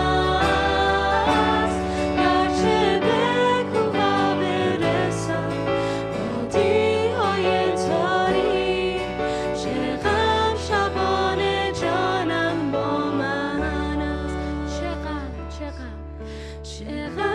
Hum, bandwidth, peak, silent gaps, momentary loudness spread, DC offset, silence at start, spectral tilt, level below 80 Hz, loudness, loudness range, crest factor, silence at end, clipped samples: none; 11.5 kHz; -8 dBFS; none; 11 LU; under 0.1%; 0 s; -5.5 dB/octave; -38 dBFS; -22 LUFS; 6 LU; 14 dB; 0 s; under 0.1%